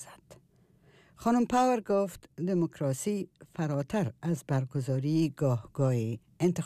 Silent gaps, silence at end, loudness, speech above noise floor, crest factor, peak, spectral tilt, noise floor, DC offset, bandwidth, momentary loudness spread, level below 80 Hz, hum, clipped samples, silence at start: none; 0 s; -30 LUFS; 34 dB; 14 dB; -16 dBFS; -7 dB/octave; -63 dBFS; under 0.1%; 15 kHz; 10 LU; -64 dBFS; none; under 0.1%; 0 s